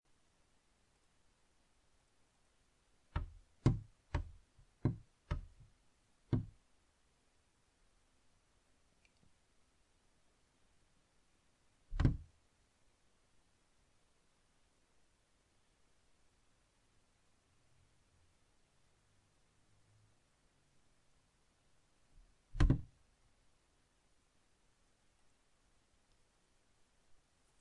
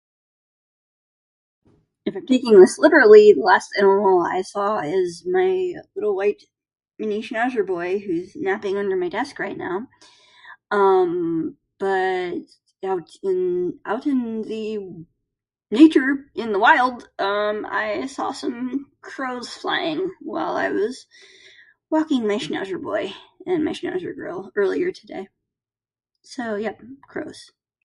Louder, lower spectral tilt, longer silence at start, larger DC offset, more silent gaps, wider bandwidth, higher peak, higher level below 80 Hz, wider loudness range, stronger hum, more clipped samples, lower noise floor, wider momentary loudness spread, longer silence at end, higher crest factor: second, -40 LUFS vs -20 LUFS; first, -8 dB/octave vs -5 dB/octave; first, 3.15 s vs 2.05 s; neither; neither; about the same, 10.5 kHz vs 11.5 kHz; second, -16 dBFS vs 0 dBFS; first, -52 dBFS vs -66 dBFS; second, 6 LU vs 12 LU; neither; neither; second, -75 dBFS vs under -90 dBFS; about the same, 18 LU vs 17 LU; first, 4.75 s vs 0.4 s; first, 30 dB vs 20 dB